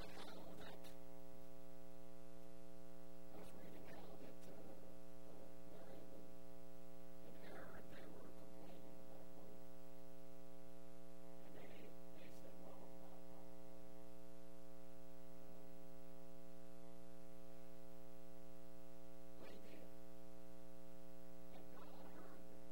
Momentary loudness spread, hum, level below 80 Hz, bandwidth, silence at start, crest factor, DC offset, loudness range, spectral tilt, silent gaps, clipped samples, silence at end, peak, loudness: 4 LU; 60 Hz at -65 dBFS; -72 dBFS; 16 kHz; 0 s; 16 dB; 0.7%; 2 LU; -5.5 dB/octave; none; under 0.1%; 0 s; -38 dBFS; -61 LUFS